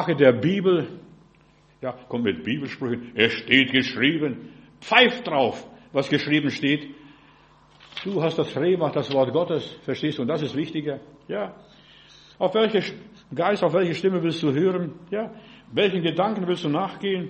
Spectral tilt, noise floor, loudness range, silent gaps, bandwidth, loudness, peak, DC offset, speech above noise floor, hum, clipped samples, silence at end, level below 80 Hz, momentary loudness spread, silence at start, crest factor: -6.5 dB/octave; -57 dBFS; 6 LU; none; 8.4 kHz; -23 LUFS; 0 dBFS; under 0.1%; 34 dB; none; under 0.1%; 0 s; -64 dBFS; 16 LU; 0 s; 24 dB